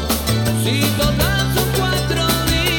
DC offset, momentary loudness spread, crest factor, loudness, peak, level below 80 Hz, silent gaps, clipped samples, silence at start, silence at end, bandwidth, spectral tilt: under 0.1%; 2 LU; 12 dB; -17 LUFS; -4 dBFS; -28 dBFS; none; under 0.1%; 0 s; 0 s; over 20 kHz; -4 dB/octave